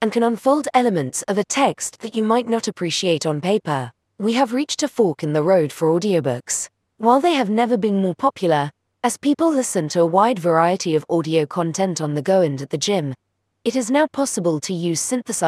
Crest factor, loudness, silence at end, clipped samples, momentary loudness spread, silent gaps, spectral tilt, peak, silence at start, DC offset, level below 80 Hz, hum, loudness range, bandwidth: 18 dB; -20 LUFS; 0 s; under 0.1%; 7 LU; none; -4.5 dB/octave; -2 dBFS; 0 s; under 0.1%; -68 dBFS; none; 2 LU; 15.5 kHz